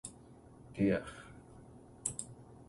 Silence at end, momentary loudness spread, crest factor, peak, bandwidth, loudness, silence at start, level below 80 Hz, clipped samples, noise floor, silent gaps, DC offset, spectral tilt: 0.05 s; 24 LU; 24 dB; -16 dBFS; 11.5 kHz; -37 LUFS; 0.05 s; -62 dBFS; under 0.1%; -57 dBFS; none; under 0.1%; -5 dB/octave